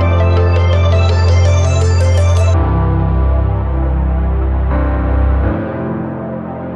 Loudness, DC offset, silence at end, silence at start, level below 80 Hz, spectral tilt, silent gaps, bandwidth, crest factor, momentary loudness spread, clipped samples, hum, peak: -14 LUFS; under 0.1%; 0 s; 0 s; -16 dBFS; -7 dB/octave; none; 8.4 kHz; 10 dB; 8 LU; under 0.1%; none; -2 dBFS